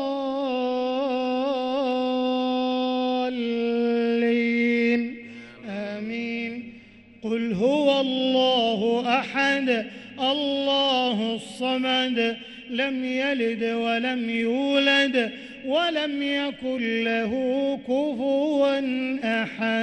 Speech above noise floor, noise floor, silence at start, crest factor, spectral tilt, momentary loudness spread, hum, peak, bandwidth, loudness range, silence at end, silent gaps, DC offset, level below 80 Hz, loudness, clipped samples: 24 dB; -48 dBFS; 0 s; 16 dB; -5 dB/octave; 9 LU; none; -8 dBFS; 11 kHz; 3 LU; 0 s; none; under 0.1%; -64 dBFS; -24 LUFS; under 0.1%